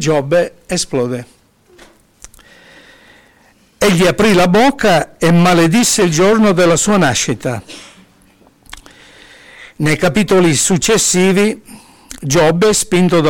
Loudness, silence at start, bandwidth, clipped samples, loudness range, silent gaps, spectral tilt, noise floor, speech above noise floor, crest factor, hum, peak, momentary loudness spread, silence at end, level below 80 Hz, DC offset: -12 LUFS; 0 s; 18 kHz; under 0.1%; 10 LU; none; -4.5 dB/octave; -50 dBFS; 38 dB; 10 dB; none; -4 dBFS; 10 LU; 0 s; -42 dBFS; under 0.1%